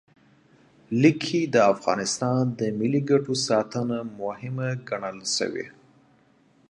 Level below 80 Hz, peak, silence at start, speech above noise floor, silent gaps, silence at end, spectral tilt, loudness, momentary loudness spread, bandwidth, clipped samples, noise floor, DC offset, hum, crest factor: -68 dBFS; -4 dBFS; 0.9 s; 36 dB; none; 1 s; -5 dB/octave; -25 LUFS; 11 LU; 11.5 kHz; under 0.1%; -60 dBFS; under 0.1%; none; 22 dB